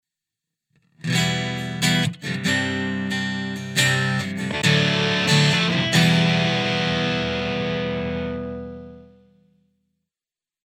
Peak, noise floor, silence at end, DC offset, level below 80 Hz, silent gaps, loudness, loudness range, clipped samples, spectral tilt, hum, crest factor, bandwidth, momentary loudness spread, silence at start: -4 dBFS; under -90 dBFS; 1.65 s; under 0.1%; -50 dBFS; none; -21 LUFS; 8 LU; under 0.1%; -4.5 dB/octave; none; 18 dB; 16 kHz; 11 LU; 1.05 s